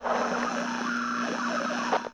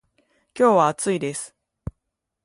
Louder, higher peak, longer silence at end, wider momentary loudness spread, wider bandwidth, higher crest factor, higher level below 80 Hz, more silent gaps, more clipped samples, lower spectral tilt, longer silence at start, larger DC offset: second, -29 LUFS vs -20 LUFS; second, -12 dBFS vs -4 dBFS; second, 0 s vs 0.95 s; second, 2 LU vs 22 LU; about the same, 10.5 kHz vs 11.5 kHz; about the same, 16 dB vs 18 dB; second, -66 dBFS vs -50 dBFS; neither; neither; second, -3.5 dB/octave vs -5 dB/octave; second, 0 s vs 0.55 s; neither